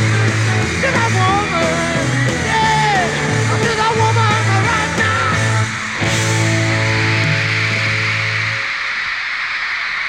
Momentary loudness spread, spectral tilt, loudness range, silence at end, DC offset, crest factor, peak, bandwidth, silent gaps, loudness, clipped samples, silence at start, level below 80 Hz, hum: 4 LU; -4.5 dB/octave; 1 LU; 0 s; under 0.1%; 14 dB; -2 dBFS; 11.5 kHz; none; -15 LUFS; under 0.1%; 0 s; -40 dBFS; none